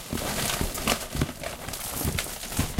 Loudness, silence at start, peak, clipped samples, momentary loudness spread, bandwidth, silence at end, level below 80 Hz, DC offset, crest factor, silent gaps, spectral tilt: -29 LUFS; 0 s; -8 dBFS; under 0.1%; 6 LU; 17 kHz; 0 s; -38 dBFS; under 0.1%; 22 dB; none; -3 dB/octave